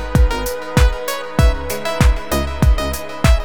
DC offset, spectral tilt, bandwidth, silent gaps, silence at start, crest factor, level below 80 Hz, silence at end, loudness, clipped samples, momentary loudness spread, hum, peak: 3%; -5.5 dB/octave; over 20 kHz; none; 0 s; 14 dB; -18 dBFS; 0 s; -18 LUFS; under 0.1%; 6 LU; none; 0 dBFS